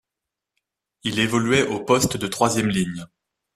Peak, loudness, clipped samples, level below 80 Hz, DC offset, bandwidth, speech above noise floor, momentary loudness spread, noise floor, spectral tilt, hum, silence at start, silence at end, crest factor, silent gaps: -4 dBFS; -21 LUFS; under 0.1%; -52 dBFS; under 0.1%; 14 kHz; 64 dB; 9 LU; -85 dBFS; -4 dB/octave; none; 1.05 s; 0.5 s; 20 dB; none